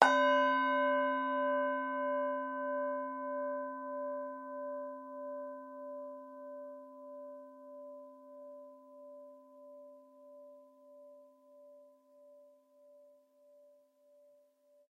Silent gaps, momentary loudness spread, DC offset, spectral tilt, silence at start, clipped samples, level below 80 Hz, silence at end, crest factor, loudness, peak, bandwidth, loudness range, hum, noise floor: none; 26 LU; under 0.1%; -2.5 dB/octave; 0 s; under 0.1%; under -90 dBFS; 1.9 s; 34 dB; -35 LUFS; -4 dBFS; 10.5 kHz; 25 LU; none; -69 dBFS